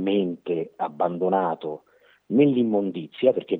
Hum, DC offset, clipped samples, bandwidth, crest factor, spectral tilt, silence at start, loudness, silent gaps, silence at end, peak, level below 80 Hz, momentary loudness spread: none; under 0.1%; under 0.1%; 4.1 kHz; 18 dB; -10 dB/octave; 0 s; -24 LUFS; none; 0 s; -6 dBFS; -80 dBFS; 11 LU